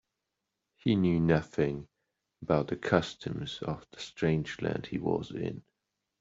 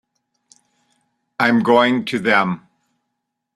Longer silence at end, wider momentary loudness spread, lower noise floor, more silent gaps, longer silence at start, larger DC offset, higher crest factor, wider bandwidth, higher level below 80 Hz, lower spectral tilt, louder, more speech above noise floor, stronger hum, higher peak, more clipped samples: second, 0.6 s vs 0.95 s; about the same, 12 LU vs 13 LU; first, -85 dBFS vs -77 dBFS; neither; second, 0.85 s vs 1.4 s; neither; about the same, 24 dB vs 20 dB; second, 7.8 kHz vs 12.5 kHz; about the same, -58 dBFS vs -62 dBFS; about the same, -7 dB/octave vs -6 dB/octave; second, -31 LUFS vs -16 LUFS; second, 55 dB vs 61 dB; neither; second, -8 dBFS vs -2 dBFS; neither